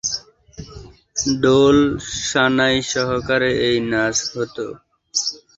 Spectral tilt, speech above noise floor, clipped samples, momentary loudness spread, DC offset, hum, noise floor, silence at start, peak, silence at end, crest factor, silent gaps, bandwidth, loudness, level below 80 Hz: -3.5 dB/octave; 23 dB; under 0.1%; 15 LU; under 0.1%; none; -40 dBFS; 0.05 s; -2 dBFS; 0.2 s; 18 dB; none; 8 kHz; -18 LUFS; -46 dBFS